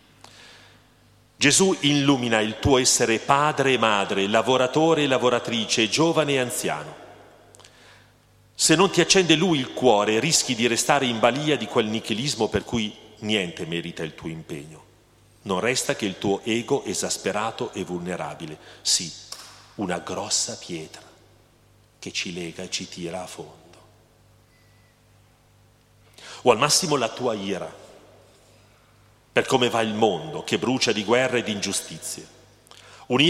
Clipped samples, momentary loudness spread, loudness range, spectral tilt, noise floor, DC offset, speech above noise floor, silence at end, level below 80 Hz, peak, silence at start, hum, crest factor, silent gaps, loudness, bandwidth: under 0.1%; 16 LU; 11 LU; -3 dB/octave; -57 dBFS; under 0.1%; 34 dB; 0 s; -56 dBFS; -2 dBFS; 0.4 s; 50 Hz at -55 dBFS; 22 dB; none; -22 LUFS; 16 kHz